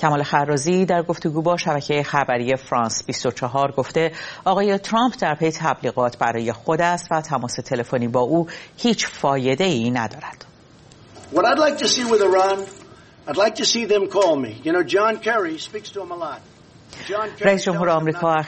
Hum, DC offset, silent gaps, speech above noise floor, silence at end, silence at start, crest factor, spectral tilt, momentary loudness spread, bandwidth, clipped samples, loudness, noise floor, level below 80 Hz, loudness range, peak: none; under 0.1%; none; 27 dB; 0 s; 0 s; 20 dB; -4.5 dB/octave; 10 LU; 8.8 kHz; under 0.1%; -20 LUFS; -48 dBFS; -58 dBFS; 3 LU; 0 dBFS